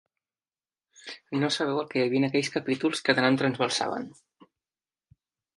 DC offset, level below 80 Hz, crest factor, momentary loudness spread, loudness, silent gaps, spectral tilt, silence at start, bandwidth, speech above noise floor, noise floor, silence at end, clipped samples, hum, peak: under 0.1%; -74 dBFS; 24 dB; 18 LU; -26 LUFS; none; -4.5 dB/octave; 1.05 s; 11.5 kHz; over 64 dB; under -90 dBFS; 1.5 s; under 0.1%; none; -6 dBFS